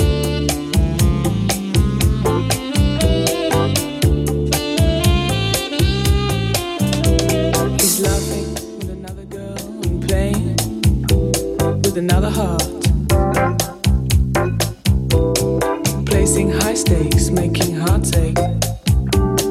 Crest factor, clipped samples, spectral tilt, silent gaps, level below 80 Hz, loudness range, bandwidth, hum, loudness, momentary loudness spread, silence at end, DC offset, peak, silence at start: 14 dB; under 0.1%; -5 dB/octave; none; -24 dBFS; 3 LU; 16.5 kHz; none; -17 LUFS; 4 LU; 0 s; under 0.1%; -2 dBFS; 0 s